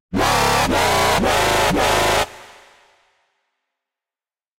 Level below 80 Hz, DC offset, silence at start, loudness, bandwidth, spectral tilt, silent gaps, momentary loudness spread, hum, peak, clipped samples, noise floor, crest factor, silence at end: -36 dBFS; under 0.1%; 0.1 s; -17 LUFS; 16 kHz; -3 dB/octave; none; 2 LU; none; -4 dBFS; under 0.1%; under -90 dBFS; 16 dB; 2.15 s